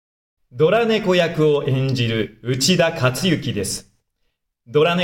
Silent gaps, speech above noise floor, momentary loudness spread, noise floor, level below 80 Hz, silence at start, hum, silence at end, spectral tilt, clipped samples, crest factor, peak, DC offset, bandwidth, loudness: none; 53 dB; 8 LU; -71 dBFS; -52 dBFS; 0.55 s; none; 0 s; -5 dB/octave; under 0.1%; 16 dB; -4 dBFS; under 0.1%; 17 kHz; -19 LUFS